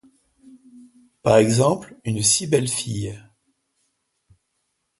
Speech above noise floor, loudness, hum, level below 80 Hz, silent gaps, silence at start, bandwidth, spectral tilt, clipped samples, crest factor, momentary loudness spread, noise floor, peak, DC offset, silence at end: 54 dB; -20 LUFS; none; -54 dBFS; none; 0.75 s; 12 kHz; -4 dB/octave; under 0.1%; 22 dB; 13 LU; -74 dBFS; -2 dBFS; under 0.1%; 1.8 s